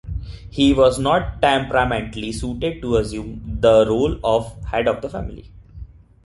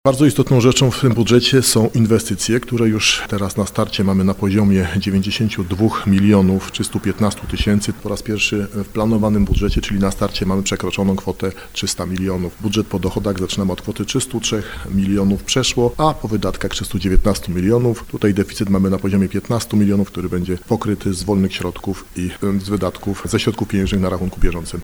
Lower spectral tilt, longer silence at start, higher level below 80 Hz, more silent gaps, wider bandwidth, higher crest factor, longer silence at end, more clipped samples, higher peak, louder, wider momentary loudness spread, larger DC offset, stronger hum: about the same, -6 dB/octave vs -5 dB/octave; about the same, 0.05 s vs 0.05 s; about the same, -34 dBFS vs -30 dBFS; neither; second, 11.5 kHz vs over 20 kHz; about the same, 18 dB vs 16 dB; first, 0.4 s vs 0 s; neither; about the same, -2 dBFS vs 0 dBFS; about the same, -19 LUFS vs -18 LUFS; first, 16 LU vs 9 LU; second, under 0.1% vs 0.3%; neither